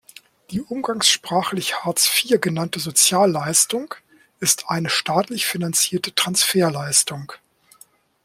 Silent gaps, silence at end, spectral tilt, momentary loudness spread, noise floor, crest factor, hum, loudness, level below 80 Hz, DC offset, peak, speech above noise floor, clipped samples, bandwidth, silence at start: none; 0.9 s; -2.5 dB/octave; 12 LU; -53 dBFS; 20 dB; none; -19 LUFS; -62 dBFS; under 0.1%; -2 dBFS; 33 dB; under 0.1%; 16.5 kHz; 0.5 s